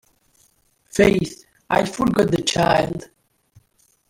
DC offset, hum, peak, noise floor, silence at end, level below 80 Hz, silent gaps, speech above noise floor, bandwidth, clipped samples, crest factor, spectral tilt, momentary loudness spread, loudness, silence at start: under 0.1%; none; -2 dBFS; -62 dBFS; 1.1 s; -46 dBFS; none; 44 dB; 16.5 kHz; under 0.1%; 20 dB; -5 dB/octave; 11 LU; -19 LUFS; 0.95 s